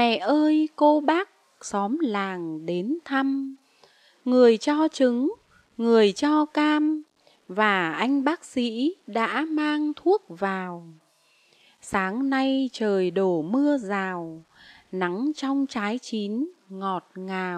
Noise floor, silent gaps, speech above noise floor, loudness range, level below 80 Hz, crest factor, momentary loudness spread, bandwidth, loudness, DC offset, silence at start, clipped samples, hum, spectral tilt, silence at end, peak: -63 dBFS; none; 39 dB; 5 LU; -68 dBFS; 20 dB; 13 LU; 10 kHz; -24 LUFS; under 0.1%; 0 s; under 0.1%; none; -5.5 dB/octave; 0 s; -6 dBFS